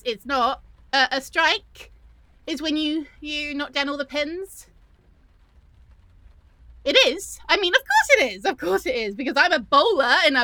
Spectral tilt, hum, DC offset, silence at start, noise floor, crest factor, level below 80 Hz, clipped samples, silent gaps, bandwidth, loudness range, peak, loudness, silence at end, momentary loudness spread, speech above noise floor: -1.5 dB/octave; none; under 0.1%; 0.05 s; -55 dBFS; 22 dB; -52 dBFS; under 0.1%; none; over 20 kHz; 11 LU; -2 dBFS; -21 LUFS; 0 s; 13 LU; 33 dB